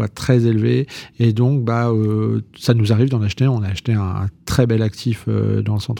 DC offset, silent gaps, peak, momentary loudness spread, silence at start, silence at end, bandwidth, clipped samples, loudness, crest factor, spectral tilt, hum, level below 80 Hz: under 0.1%; none; -2 dBFS; 6 LU; 0 s; 0 s; 15.5 kHz; under 0.1%; -18 LUFS; 16 dB; -7.5 dB/octave; none; -46 dBFS